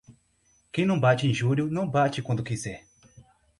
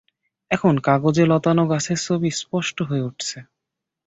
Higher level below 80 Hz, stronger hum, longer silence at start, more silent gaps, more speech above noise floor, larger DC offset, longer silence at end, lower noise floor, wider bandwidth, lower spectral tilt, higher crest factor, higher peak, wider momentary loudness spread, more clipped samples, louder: about the same, -58 dBFS vs -56 dBFS; neither; second, 0.1 s vs 0.5 s; neither; second, 41 dB vs 63 dB; neither; second, 0.4 s vs 0.65 s; second, -66 dBFS vs -83 dBFS; first, 11.5 kHz vs 8.2 kHz; about the same, -6.5 dB/octave vs -5.5 dB/octave; about the same, 18 dB vs 18 dB; second, -10 dBFS vs -2 dBFS; about the same, 12 LU vs 10 LU; neither; second, -26 LUFS vs -20 LUFS